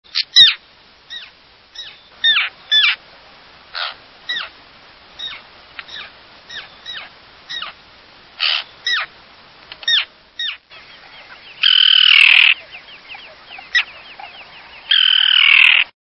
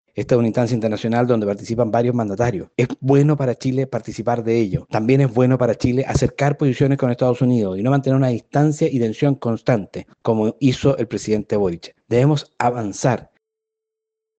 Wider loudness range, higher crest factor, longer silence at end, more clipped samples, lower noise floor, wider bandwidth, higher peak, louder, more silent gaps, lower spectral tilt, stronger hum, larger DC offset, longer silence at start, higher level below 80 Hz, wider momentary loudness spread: first, 18 LU vs 2 LU; about the same, 18 dB vs 16 dB; second, 0.2 s vs 1.15 s; neither; second, -48 dBFS vs -83 dBFS; first, 11 kHz vs 8.6 kHz; about the same, 0 dBFS vs -2 dBFS; first, -12 LUFS vs -19 LUFS; neither; second, 2 dB/octave vs -7.5 dB/octave; neither; neither; about the same, 0.15 s vs 0.15 s; second, -62 dBFS vs -46 dBFS; first, 27 LU vs 6 LU